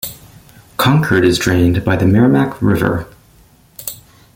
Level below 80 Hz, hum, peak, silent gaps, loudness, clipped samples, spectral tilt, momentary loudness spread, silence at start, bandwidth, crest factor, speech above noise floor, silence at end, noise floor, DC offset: -40 dBFS; none; 0 dBFS; none; -13 LUFS; under 0.1%; -6 dB/octave; 16 LU; 0.05 s; 17 kHz; 14 dB; 35 dB; 0.4 s; -48 dBFS; under 0.1%